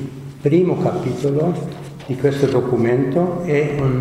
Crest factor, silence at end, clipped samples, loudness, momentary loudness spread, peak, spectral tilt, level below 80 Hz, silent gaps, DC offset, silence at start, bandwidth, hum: 16 dB; 0 s; under 0.1%; -18 LUFS; 11 LU; -2 dBFS; -8 dB/octave; -46 dBFS; none; under 0.1%; 0 s; 12.5 kHz; none